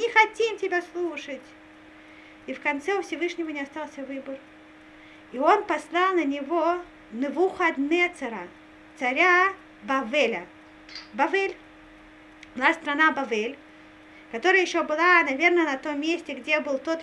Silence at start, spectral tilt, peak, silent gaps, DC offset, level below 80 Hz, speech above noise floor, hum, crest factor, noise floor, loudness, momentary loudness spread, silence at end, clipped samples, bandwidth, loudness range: 0 s; -3 dB/octave; -4 dBFS; none; under 0.1%; -66 dBFS; 24 dB; none; 22 dB; -49 dBFS; -24 LUFS; 18 LU; 0 s; under 0.1%; 11 kHz; 9 LU